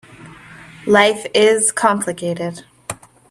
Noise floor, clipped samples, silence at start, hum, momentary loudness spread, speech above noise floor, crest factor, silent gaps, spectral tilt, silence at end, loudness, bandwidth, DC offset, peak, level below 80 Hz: -40 dBFS; under 0.1%; 0.2 s; none; 18 LU; 24 dB; 18 dB; none; -3 dB/octave; 0.35 s; -15 LUFS; 13 kHz; under 0.1%; 0 dBFS; -58 dBFS